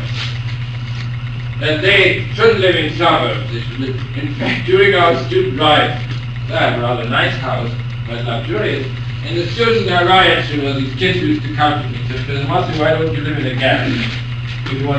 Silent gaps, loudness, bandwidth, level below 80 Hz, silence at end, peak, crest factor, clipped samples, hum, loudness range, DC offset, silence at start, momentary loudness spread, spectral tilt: none; -15 LUFS; 8.4 kHz; -36 dBFS; 0 s; 0 dBFS; 16 dB; under 0.1%; none; 3 LU; 0.1%; 0 s; 12 LU; -6.5 dB/octave